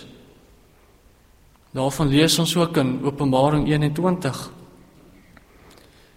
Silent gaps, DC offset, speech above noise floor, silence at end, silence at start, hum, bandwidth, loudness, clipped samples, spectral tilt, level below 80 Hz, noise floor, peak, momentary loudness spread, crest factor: none; under 0.1%; 34 dB; 1.5 s; 0 s; none; 16 kHz; -20 LUFS; under 0.1%; -5 dB/octave; -46 dBFS; -54 dBFS; -4 dBFS; 11 LU; 18 dB